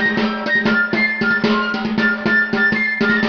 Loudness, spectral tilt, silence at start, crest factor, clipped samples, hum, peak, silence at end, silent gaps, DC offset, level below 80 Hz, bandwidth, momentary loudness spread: -16 LUFS; -6 dB/octave; 0 s; 14 dB; under 0.1%; none; -4 dBFS; 0 s; none; under 0.1%; -50 dBFS; 6.8 kHz; 3 LU